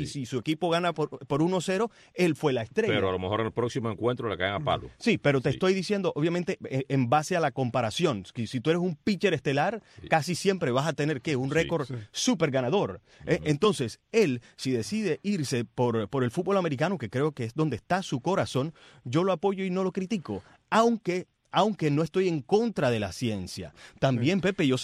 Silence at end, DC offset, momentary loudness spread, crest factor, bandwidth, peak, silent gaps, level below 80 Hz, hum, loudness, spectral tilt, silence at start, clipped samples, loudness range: 0 s; under 0.1%; 7 LU; 18 dB; 14 kHz; -10 dBFS; none; -60 dBFS; none; -28 LUFS; -5.5 dB/octave; 0 s; under 0.1%; 2 LU